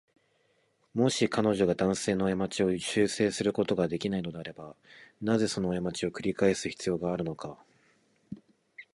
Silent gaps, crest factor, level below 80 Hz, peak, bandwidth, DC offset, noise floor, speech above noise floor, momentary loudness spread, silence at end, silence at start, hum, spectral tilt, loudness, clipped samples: none; 20 dB; -60 dBFS; -12 dBFS; 11.5 kHz; under 0.1%; -71 dBFS; 42 dB; 16 LU; 0.1 s; 0.95 s; none; -5 dB/octave; -29 LUFS; under 0.1%